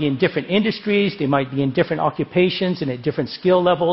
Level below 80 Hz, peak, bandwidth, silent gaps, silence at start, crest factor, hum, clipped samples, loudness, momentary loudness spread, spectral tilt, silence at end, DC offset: -54 dBFS; -2 dBFS; 5.8 kHz; none; 0 s; 16 dB; none; under 0.1%; -20 LUFS; 6 LU; -10.5 dB/octave; 0 s; under 0.1%